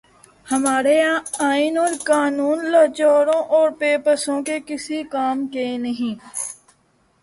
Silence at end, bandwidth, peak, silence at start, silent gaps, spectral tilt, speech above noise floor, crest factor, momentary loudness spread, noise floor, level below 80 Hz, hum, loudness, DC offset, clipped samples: 0.7 s; 11.5 kHz; -4 dBFS; 0.45 s; none; -2.5 dB/octave; 42 dB; 16 dB; 10 LU; -61 dBFS; -66 dBFS; none; -19 LUFS; under 0.1%; under 0.1%